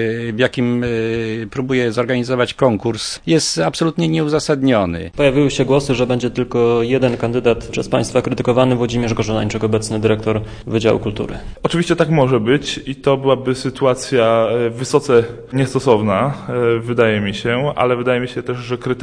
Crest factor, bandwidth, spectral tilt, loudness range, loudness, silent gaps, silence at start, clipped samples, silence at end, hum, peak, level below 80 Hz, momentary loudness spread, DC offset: 16 dB; 10.5 kHz; -5.5 dB/octave; 2 LU; -17 LUFS; none; 0 s; under 0.1%; 0 s; none; 0 dBFS; -40 dBFS; 7 LU; under 0.1%